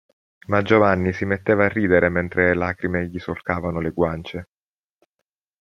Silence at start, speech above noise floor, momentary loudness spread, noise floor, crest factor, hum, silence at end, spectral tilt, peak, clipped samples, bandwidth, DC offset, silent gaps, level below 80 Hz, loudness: 0.5 s; over 70 dB; 12 LU; under -90 dBFS; 20 dB; none; 1.15 s; -8 dB/octave; -2 dBFS; under 0.1%; 7 kHz; under 0.1%; none; -50 dBFS; -21 LUFS